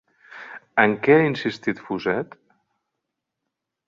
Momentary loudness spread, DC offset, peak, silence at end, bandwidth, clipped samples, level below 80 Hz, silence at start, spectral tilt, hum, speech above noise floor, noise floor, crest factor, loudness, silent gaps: 22 LU; under 0.1%; -2 dBFS; 1.65 s; 7.4 kHz; under 0.1%; -64 dBFS; 0.35 s; -7 dB/octave; none; 62 dB; -82 dBFS; 22 dB; -21 LUFS; none